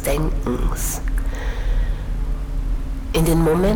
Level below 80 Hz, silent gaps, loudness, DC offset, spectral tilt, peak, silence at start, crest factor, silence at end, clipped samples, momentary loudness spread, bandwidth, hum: -22 dBFS; none; -23 LUFS; under 0.1%; -5.5 dB/octave; -8 dBFS; 0 s; 12 dB; 0 s; under 0.1%; 10 LU; over 20 kHz; none